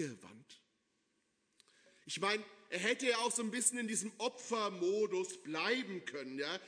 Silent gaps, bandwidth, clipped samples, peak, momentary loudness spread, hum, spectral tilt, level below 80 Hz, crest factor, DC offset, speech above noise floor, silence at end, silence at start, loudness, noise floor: none; 11 kHz; under 0.1%; -18 dBFS; 11 LU; none; -2 dB/octave; under -90 dBFS; 22 dB; under 0.1%; 43 dB; 0 s; 0 s; -37 LUFS; -80 dBFS